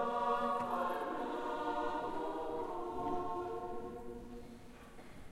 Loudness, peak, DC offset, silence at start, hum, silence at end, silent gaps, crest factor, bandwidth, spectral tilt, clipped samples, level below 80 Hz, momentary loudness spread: -39 LUFS; -22 dBFS; under 0.1%; 0 s; none; 0 s; none; 16 dB; 16 kHz; -5.5 dB/octave; under 0.1%; -58 dBFS; 19 LU